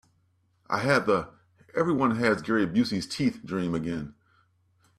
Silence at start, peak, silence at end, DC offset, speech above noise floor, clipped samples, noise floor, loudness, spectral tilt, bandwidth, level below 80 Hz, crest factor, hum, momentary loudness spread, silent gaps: 0.7 s; -8 dBFS; 0.85 s; under 0.1%; 43 dB; under 0.1%; -68 dBFS; -27 LUFS; -6 dB/octave; 13.5 kHz; -60 dBFS; 20 dB; none; 10 LU; none